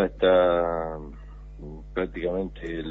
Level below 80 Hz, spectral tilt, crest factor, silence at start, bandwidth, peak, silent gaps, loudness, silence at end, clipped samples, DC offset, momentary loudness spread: -42 dBFS; -8 dB/octave; 18 dB; 0 s; 4.1 kHz; -8 dBFS; none; -25 LUFS; 0 s; under 0.1%; under 0.1%; 23 LU